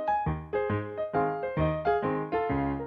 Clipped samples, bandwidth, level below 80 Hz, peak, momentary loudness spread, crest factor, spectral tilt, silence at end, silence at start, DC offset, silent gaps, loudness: under 0.1%; 5.2 kHz; -46 dBFS; -14 dBFS; 4 LU; 14 dB; -10 dB/octave; 0 s; 0 s; under 0.1%; none; -30 LUFS